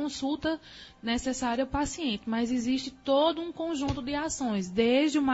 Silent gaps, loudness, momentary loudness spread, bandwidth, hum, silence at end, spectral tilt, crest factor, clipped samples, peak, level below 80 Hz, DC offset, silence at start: none; -29 LUFS; 8 LU; 8 kHz; none; 0 s; -4 dB/octave; 16 dB; under 0.1%; -12 dBFS; -50 dBFS; under 0.1%; 0 s